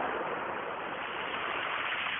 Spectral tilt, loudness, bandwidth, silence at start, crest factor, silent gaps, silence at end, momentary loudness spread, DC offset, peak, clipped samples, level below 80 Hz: 2.5 dB/octave; -34 LUFS; 3.8 kHz; 0 s; 14 dB; none; 0 s; 5 LU; under 0.1%; -20 dBFS; under 0.1%; -68 dBFS